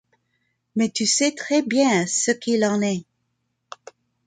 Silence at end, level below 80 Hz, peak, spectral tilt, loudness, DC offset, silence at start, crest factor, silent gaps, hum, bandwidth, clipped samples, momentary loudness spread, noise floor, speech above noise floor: 1.25 s; -68 dBFS; -6 dBFS; -3 dB/octave; -21 LUFS; under 0.1%; 0.75 s; 18 dB; none; none; 9.6 kHz; under 0.1%; 14 LU; -74 dBFS; 53 dB